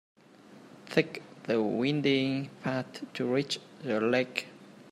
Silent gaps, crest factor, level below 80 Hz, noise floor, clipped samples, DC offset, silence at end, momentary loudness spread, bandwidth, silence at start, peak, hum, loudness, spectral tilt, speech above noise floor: none; 24 dB; -74 dBFS; -54 dBFS; under 0.1%; under 0.1%; 0.1 s; 10 LU; 13 kHz; 0.5 s; -8 dBFS; none; -31 LUFS; -5.5 dB/octave; 25 dB